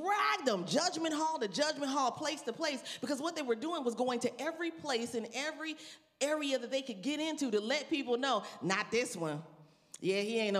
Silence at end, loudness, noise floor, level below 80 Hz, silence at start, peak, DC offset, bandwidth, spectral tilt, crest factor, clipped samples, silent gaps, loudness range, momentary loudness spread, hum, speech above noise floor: 0 s; -35 LUFS; -57 dBFS; -84 dBFS; 0 s; -16 dBFS; under 0.1%; 15 kHz; -3.5 dB/octave; 18 dB; under 0.1%; none; 2 LU; 7 LU; none; 22 dB